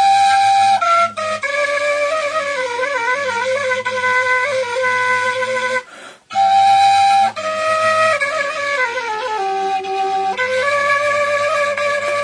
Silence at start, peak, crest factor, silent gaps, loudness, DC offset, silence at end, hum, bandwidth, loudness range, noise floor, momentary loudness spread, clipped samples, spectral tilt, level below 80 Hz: 0 s; -4 dBFS; 14 dB; none; -16 LUFS; under 0.1%; 0 s; none; 10.5 kHz; 3 LU; -38 dBFS; 8 LU; under 0.1%; -1.5 dB/octave; -64 dBFS